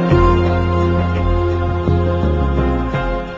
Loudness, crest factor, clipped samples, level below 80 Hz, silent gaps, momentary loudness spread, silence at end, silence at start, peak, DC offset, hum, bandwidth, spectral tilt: -16 LUFS; 14 dB; under 0.1%; -20 dBFS; none; 5 LU; 0 s; 0 s; 0 dBFS; under 0.1%; none; 7.6 kHz; -9 dB/octave